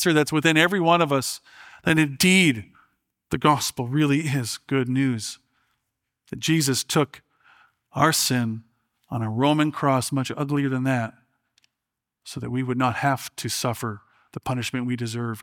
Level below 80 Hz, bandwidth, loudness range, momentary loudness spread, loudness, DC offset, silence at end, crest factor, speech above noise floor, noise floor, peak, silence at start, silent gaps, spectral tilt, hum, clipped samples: -60 dBFS; 18 kHz; 6 LU; 15 LU; -23 LUFS; under 0.1%; 0 s; 20 dB; 62 dB; -84 dBFS; -4 dBFS; 0 s; none; -4.5 dB/octave; none; under 0.1%